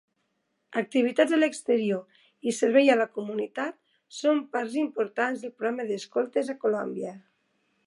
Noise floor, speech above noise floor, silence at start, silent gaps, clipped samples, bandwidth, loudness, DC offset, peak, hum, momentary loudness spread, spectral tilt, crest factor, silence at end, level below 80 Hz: -76 dBFS; 50 dB; 0.7 s; none; under 0.1%; 11.5 kHz; -27 LUFS; under 0.1%; -8 dBFS; none; 11 LU; -4.5 dB/octave; 20 dB; 0.7 s; -84 dBFS